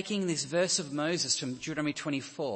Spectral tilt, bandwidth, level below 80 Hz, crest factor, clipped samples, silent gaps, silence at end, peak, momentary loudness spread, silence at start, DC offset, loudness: -3 dB/octave; 8.8 kHz; -70 dBFS; 18 dB; under 0.1%; none; 0 s; -14 dBFS; 6 LU; 0 s; under 0.1%; -31 LUFS